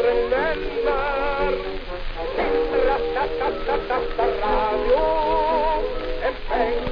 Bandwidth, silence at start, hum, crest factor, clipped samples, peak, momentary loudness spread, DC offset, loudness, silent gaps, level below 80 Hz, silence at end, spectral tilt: 5.2 kHz; 0 s; none; 12 dB; under 0.1%; -8 dBFS; 7 LU; 0.6%; -23 LUFS; none; -32 dBFS; 0 s; -7 dB/octave